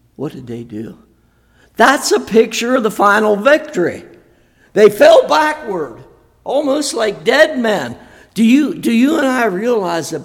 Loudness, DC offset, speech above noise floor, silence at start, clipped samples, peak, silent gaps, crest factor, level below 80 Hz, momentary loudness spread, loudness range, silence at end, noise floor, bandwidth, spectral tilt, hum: -13 LUFS; under 0.1%; 40 dB; 0.2 s; 0.2%; 0 dBFS; none; 14 dB; -54 dBFS; 17 LU; 3 LU; 0 s; -53 dBFS; 17.5 kHz; -4 dB/octave; none